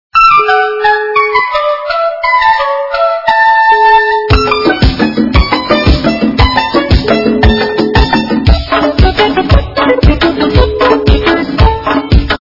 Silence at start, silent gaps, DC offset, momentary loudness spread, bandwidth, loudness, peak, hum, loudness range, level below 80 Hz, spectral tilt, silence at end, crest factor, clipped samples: 0.15 s; none; under 0.1%; 5 LU; 6 kHz; -9 LUFS; 0 dBFS; none; 1 LU; -16 dBFS; -7 dB/octave; 0.05 s; 8 dB; 0.9%